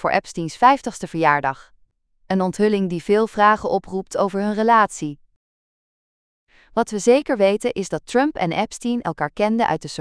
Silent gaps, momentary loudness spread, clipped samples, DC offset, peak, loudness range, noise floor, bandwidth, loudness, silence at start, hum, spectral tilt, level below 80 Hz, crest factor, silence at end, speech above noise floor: 5.36-6.47 s; 10 LU; under 0.1%; under 0.1%; -2 dBFS; 3 LU; -59 dBFS; 11 kHz; -20 LUFS; 0 s; none; -5 dB/octave; -52 dBFS; 20 dB; 0 s; 40 dB